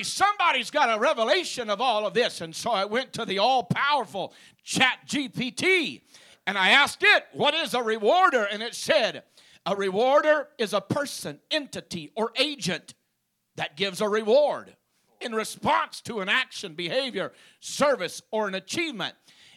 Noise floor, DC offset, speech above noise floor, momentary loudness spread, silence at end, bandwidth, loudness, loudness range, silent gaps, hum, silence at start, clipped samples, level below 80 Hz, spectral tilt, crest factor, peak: -76 dBFS; under 0.1%; 51 dB; 13 LU; 0.45 s; 15 kHz; -24 LUFS; 6 LU; none; none; 0 s; under 0.1%; -68 dBFS; -3 dB/octave; 20 dB; -6 dBFS